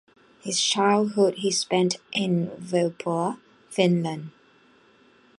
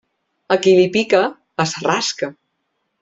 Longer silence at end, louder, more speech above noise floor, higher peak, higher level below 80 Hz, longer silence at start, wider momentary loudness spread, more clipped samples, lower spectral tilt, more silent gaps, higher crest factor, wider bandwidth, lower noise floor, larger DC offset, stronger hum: first, 1.1 s vs 0.7 s; second, -24 LUFS vs -17 LUFS; second, 34 dB vs 56 dB; second, -6 dBFS vs -2 dBFS; second, -72 dBFS vs -60 dBFS; about the same, 0.45 s vs 0.5 s; first, 12 LU vs 9 LU; neither; about the same, -4.5 dB/octave vs -4 dB/octave; neither; about the same, 20 dB vs 16 dB; first, 11.5 kHz vs 7.8 kHz; second, -58 dBFS vs -72 dBFS; neither; neither